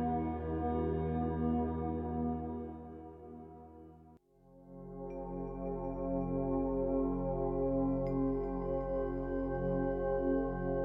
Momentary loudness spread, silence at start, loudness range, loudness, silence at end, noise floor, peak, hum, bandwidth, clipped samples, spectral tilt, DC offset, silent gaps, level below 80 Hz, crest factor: 17 LU; 0 s; 10 LU; -36 LUFS; 0 s; -61 dBFS; -24 dBFS; none; 3.9 kHz; under 0.1%; -10 dB/octave; under 0.1%; none; -46 dBFS; 12 dB